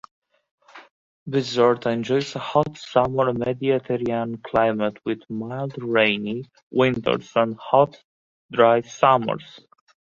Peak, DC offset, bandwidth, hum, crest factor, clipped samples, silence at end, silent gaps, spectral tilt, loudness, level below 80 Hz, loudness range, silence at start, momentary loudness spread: -2 dBFS; under 0.1%; 7.6 kHz; none; 20 dB; under 0.1%; 0.55 s; 0.91-1.26 s, 6.63-6.70 s, 8.04-8.49 s; -6 dB/octave; -22 LUFS; -58 dBFS; 3 LU; 0.75 s; 11 LU